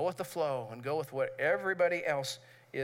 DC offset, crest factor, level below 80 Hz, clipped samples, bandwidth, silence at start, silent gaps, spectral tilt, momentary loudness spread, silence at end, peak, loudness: under 0.1%; 16 dB; -84 dBFS; under 0.1%; 16 kHz; 0 s; none; -4.5 dB/octave; 9 LU; 0 s; -18 dBFS; -33 LUFS